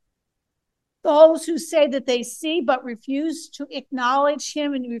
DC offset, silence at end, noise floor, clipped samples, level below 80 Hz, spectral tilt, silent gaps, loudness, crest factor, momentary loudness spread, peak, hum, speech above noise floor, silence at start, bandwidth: under 0.1%; 0 s; -79 dBFS; under 0.1%; -76 dBFS; -2.5 dB/octave; none; -21 LUFS; 20 dB; 14 LU; -2 dBFS; none; 59 dB; 1.05 s; 12.5 kHz